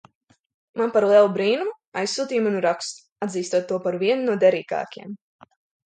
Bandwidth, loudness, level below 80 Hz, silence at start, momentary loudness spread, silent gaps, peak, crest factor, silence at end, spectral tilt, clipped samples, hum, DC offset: 9.4 kHz; -22 LUFS; -74 dBFS; 0.75 s; 17 LU; 1.87-1.92 s, 3.12-3.16 s; -6 dBFS; 18 dB; 0.7 s; -4.5 dB/octave; under 0.1%; none; under 0.1%